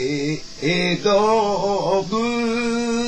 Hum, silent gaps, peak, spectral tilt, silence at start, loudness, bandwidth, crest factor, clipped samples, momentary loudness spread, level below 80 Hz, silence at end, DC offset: none; none; -6 dBFS; -5 dB/octave; 0 s; -20 LUFS; 8.8 kHz; 14 dB; under 0.1%; 6 LU; -48 dBFS; 0 s; under 0.1%